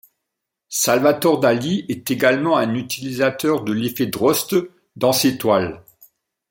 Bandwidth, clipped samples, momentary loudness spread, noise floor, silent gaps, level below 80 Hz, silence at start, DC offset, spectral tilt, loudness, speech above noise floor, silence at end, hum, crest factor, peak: 17 kHz; under 0.1%; 8 LU; -81 dBFS; none; -60 dBFS; 0.7 s; under 0.1%; -4 dB/octave; -19 LUFS; 62 dB; 0.7 s; none; 18 dB; -2 dBFS